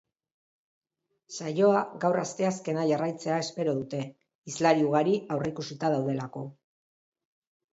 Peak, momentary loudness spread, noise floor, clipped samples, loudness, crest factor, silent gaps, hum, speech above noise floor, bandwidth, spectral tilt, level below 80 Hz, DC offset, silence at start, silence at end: -10 dBFS; 14 LU; -66 dBFS; under 0.1%; -28 LUFS; 20 dB; 4.35-4.42 s; none; 39 dB; 8 kHz; -6 dB/octave; -72 dBFS; under 0.1%; 1.3 s; 1.2 s